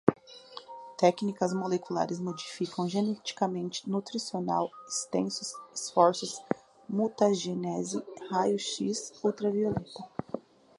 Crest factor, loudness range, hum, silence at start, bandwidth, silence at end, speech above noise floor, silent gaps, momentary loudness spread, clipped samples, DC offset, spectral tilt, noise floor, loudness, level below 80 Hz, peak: 26 dB; 3 LU; none; 0.05 s; 11.5 kHz; 0.4 s; 19 dB; none; 13 LU; under 0.1%; under 0.1%; -5 dB/octave; -49 dBFS; -31 LUFS; -68 dBFS; -6 dBFS